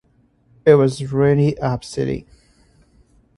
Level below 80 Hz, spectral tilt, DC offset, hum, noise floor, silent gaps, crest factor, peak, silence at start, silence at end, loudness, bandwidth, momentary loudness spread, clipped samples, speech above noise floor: -48 dBFS; -7.5 dB/octave; under 0.1%; none; -58 dBFS; none; 20 dB; 0 dBFS; 0.65 s; 1.15 s; -18 LUFS; 11.5 kHz; 10 LU; under 0.1%; 41 dB